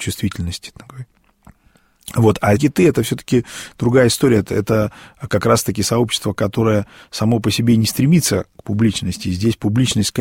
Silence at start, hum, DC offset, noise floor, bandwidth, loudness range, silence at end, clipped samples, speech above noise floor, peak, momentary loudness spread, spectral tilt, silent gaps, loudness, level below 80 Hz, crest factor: 0 s; none; under 0.1%; -55 dBFS; 16.5 kHz; 3 LU; 0 s; under 0.1%; 39 dB; -2 dBFS; 12 LU; -5.5 dB/octave; none; -17 LUFS; -42 dBFS; 16 dB